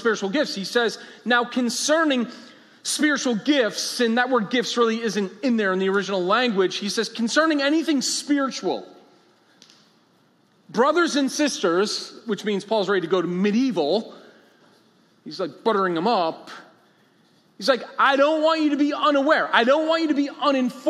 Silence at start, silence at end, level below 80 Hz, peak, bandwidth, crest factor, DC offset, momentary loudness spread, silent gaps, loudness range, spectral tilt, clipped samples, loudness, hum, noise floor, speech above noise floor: 0 s; 0 s; -82 dBFS; -4 dBFS; 14 kHz; 20 dB; under 0.1%; 8 LU; none; 5 LU; -3.5 dB/octave; under 0.1%; -22 LUFS; none; -60 dBFS; 39 dB